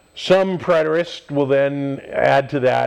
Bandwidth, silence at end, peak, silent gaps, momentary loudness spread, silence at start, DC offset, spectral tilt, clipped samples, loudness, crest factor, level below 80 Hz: 10.5 kHz; 0 s; -2 dBFS; none; 7 LU; 0.15 s; under 0.1%; -6.5 dB/octave; under 0.1%; -18 LUFS; 14 dB; -56 dBFS